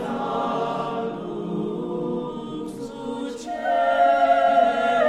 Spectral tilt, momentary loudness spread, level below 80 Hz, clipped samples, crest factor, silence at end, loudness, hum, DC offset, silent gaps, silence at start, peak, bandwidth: -6 dB/octave; 14 LU; -56 dBFS; under 0.1%; 16 dB; 0 s; -23 LUFS; none; under 0.1%; none; 0 s; -8 dBFS; 10.5 kHz